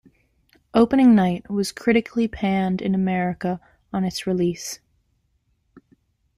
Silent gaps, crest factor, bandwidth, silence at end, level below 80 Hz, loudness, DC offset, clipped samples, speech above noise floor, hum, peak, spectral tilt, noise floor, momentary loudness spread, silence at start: none; 18 dB; 14 kHz; 0.6 s; -52 dBFS; -21 LUFS; under 0.1%; under 0.1%; 48 dB; none; -4 dBFS; -6 dB/octave; -68 dBFS; 14 LU; 0.75 s